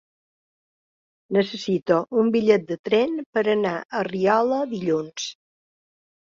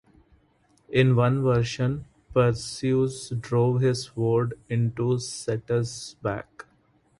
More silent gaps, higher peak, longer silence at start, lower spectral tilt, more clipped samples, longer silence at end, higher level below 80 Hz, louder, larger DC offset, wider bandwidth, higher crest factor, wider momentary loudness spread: first, 2.79-2.84 s, 3.26-3.33 s, 3.85-3.89 s vs none; about the same, -4 dBFS vs -6 dBFS; first, 1.3 s vs 0.9 s; about the same, -5.5 dB/octave vs -6.5 dB/octave; neither; first, 1 s vs 0.55 s; second, -66 dBFS vs -54 dBFS; first, -22 LUFS vs -25 LUFS; neither; second, 7.6 kHz vs 11.5 kHz; about the same, 20 dB vs 18 dB; second, 7 LU vs 10 LU